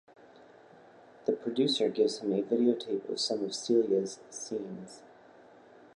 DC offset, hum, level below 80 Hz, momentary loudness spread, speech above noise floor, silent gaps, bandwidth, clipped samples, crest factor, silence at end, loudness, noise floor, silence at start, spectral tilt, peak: under 0.1%; none; -82 dBFS; 14 LU; 26 dB; none; 11.5 kHz; under 0.1%; 18 dB; 0.9 s; -31 LUFS; -56 dBFS; 1.3 s; -4.5 dB/octave; -14 dBFS